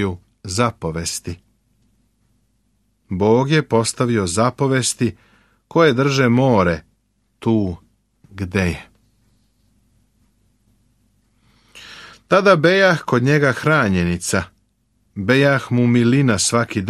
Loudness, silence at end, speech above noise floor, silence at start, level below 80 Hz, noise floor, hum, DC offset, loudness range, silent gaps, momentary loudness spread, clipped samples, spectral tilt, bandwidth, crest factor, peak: -17 LUFS; 0 s; 48 dB; 0 s; -48 dBFS; -65 dBFS; none; under 0.1%; 10 LU; none; 16 LU; under 0.1%; -5 dB/octave; 13.5 kHz; 18 dB; -2 dBFS